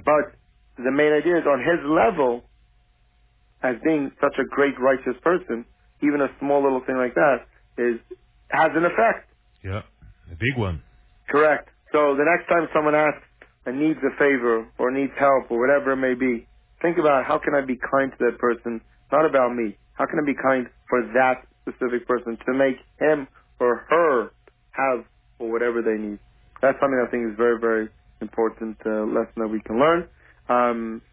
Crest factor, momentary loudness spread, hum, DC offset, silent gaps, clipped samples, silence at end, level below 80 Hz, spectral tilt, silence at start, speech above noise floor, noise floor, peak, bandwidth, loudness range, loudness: 16 dB; 13 LU; none; under 0.1%; none; under 0.1%; 0.15 s; -52 dBFS; -10 dB/octave; 0.05 s; 39 dB; -60 dBFS; -6 dBFS; 4 kHz; 3 LU; -22 LUFS